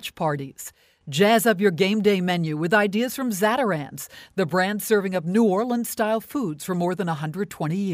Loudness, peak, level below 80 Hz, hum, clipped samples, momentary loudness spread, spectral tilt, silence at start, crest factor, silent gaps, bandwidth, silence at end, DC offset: -23 LUFS; -6 dBFS; -64 dBFS; none; under 0.1%; 10 LU; -5 dB/octave; 0 s; 16 dB; none; 16 kHz; 0 s; under 0.1%